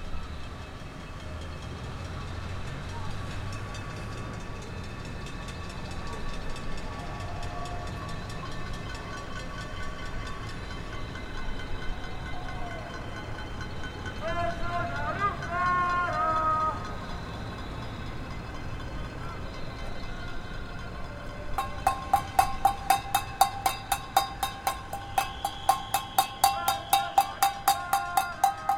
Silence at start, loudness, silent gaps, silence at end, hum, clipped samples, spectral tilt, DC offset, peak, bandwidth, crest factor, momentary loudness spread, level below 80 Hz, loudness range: 0 s; -32 LUFS; none; 0 s; none; under 0.1%; -3.5 dB/octave; under 0.1%; -6 dBFS; 16.5 kHz; 26 dB; 13 LU; -42 dBFS; 11 LU